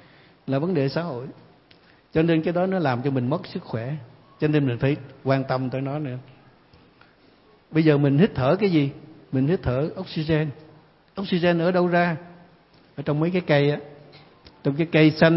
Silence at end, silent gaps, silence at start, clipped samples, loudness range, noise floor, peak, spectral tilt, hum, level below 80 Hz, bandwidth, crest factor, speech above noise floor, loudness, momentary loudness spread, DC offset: 0 s; none; 0.5 s; under 0.1%; 4 LU; -56 dBFS; -4 dBFS; -11.5 dB/octave; none; -54 dBFS; 5.8 kHz; 20 dB; 34 dB; -23 LUFS; 13 LU; under 0.1%